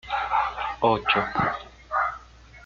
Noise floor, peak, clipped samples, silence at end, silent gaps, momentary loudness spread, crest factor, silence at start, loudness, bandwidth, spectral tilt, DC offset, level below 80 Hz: -47 dBFS; -8 dBFS; under 0.1%; 0 s; none; 7 LU; 18 dB; 0.05 s; -25 LUFS; 7.4 kHz; -5.5 dB/octave; under 0.1%; -50 dBFS